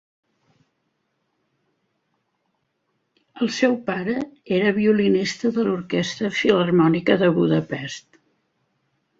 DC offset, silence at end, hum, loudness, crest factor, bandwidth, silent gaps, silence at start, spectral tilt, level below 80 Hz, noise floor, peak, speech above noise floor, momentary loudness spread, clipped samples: under 0.1%; 1.2 s; none; -21 LUFS; 20 dB; 7.8 kHz; none; 3.35 s; -6 dB/octave; -62 dBFS; -73 dBFS; -2 dBFS; 53 dB; 10 LU; under 0.1%